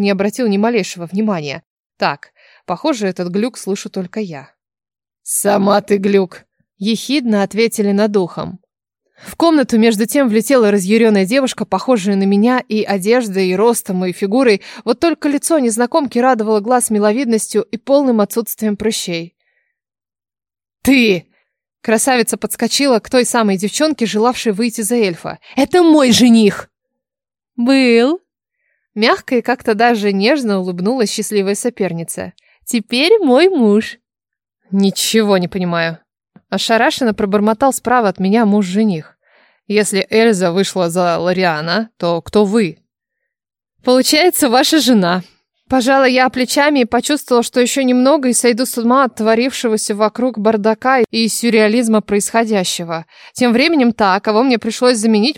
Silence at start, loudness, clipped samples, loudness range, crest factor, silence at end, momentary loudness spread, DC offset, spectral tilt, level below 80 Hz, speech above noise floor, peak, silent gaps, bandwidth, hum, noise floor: 0 s; -14 LUFS; under 0.1%; 5 LU; 14 dB; 0.05 s; 10 LU; under 0.1%; -4 dB/octave; -54 dBFS; over 76 dB; 0 dBFS; 1.66-1.90 s; 17 kHz; none; under -90 dBFS